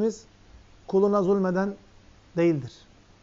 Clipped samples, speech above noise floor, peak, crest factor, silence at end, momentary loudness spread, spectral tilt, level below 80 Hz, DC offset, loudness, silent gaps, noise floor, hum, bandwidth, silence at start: under 0.1%; 29 dB; -12 dBFS; 16 dB; 0.55 s; 21 LU; -7.5 dB/octave; -58 dBFS; under 0.1%; -25 LUFS; none; -53 dBFS; none; 7.6 kHz; 0 s